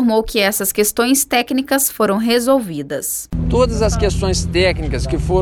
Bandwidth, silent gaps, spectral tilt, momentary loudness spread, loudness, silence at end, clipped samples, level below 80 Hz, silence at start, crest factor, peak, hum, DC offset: 20 kHz; none; -4 dB/octave; 7 LU; -16 LUFS; 0 s; under 0.1%; -26 dBFS; 0 s; 12 dB; -4 dBFS; none; under 0.1%